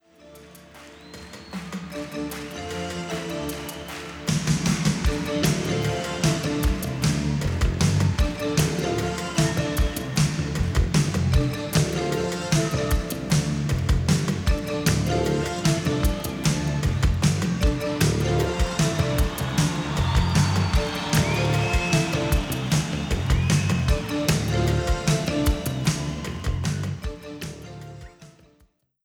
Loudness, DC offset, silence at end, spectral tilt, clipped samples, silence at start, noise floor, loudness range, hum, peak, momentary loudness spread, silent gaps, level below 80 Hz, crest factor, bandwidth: -24 LUFS; under 0.1%; 0.75 s; -5 dB/octave; under 0.1%; 0.25 s; -62 dBFS; 6 LU; none; -6 dBFS; 11 LU; none; -30 dBFS; 16 dB; 19.5 kHz